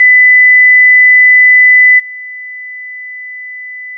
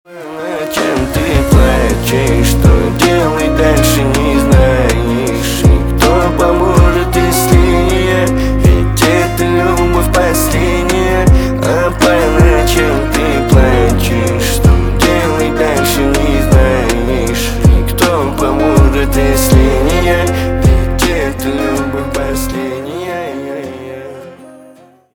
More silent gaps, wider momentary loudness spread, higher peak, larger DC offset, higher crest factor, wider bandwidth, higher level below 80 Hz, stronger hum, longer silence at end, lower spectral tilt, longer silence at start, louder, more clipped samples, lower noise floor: neither; first, 21 LU vs 8 LU; about the same, -2 dBFS vs 0 dBFS; neither; about the same, 6 dB vs 10 dB; second, 2.2 kHz vs over 20 kHz; second, under -90 dBFS vs -16 dBFS; first, 50 Hz at -110 dBFS vs none; second, 0 s vs 0.6 s; second, 2.5 dB/octave vs -5.5 dB/octave; about the same, 0 s vs 0.1 s; first, -2 LUFS vs -11 LUFS; neither; second, -25 dBFS vs -41 dBFS